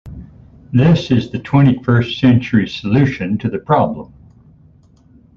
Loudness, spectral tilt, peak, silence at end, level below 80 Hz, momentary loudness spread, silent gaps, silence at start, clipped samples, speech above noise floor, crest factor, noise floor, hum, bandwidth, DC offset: -15 LUFS; -8.5 dB/octave; 0 dBFS; 1.3 s; -42 dBFS; 8 LU; none; 0.05 s; under 0.1%; 34 dB; 14 dB; -48 dBFS; none; 7 kHz; under 0.1%